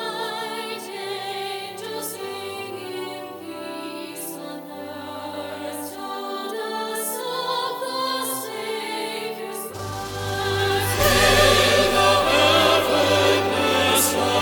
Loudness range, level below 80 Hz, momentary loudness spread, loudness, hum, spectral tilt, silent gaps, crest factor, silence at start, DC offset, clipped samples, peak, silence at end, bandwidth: 15 LU; -42 dBFS; 16 LU; -22 LUFS; none; -3 dB/octave; none; 20 dB; 0 s; under 0.1%; under 0.1%; -4 dBFS; 0 s; 18 kHz